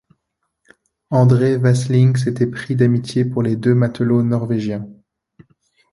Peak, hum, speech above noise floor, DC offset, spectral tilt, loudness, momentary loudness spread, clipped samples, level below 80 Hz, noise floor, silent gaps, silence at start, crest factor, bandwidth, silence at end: -2 dBFS; none; 59 dB; under 0.1%; -8 dB/octave; -17 LUFS; 7 LU; under 0.1%; -54 dBFS; -74 dBFS; none; 1.1 s; 16 dB; 11.5 kHz; 1 s